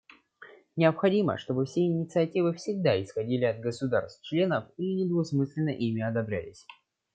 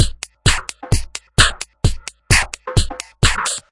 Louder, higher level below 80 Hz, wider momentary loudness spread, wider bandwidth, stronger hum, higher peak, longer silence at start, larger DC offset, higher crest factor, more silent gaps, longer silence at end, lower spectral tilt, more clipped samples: second, -28 LUFS vs -18 LUFS; second, -70 dBFS vs -24 dBFS; about the same, 7 LU vs 8 LU; second, 9 kHz vs 11.5 kHz; neither; second, -10 dBFS vs 0 dBFS; first, 0.4 s vs 0 s; neither; about the same, 18 dB vs 18 dB; neither; first, 0.4 s vs 0.1 s; first, -7.5 dB/octave vs -2.5 dB/octave; neither